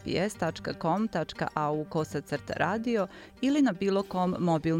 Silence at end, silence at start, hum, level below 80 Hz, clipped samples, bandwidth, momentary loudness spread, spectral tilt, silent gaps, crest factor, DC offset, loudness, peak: 0 s; 0 s; none; -58 dBFS; under 0.1%; 16.5 kHz; 7 LU; -6.5 dB/octave; none; 16 dB; under 0.1%; -30 LUFS; -14 dBFS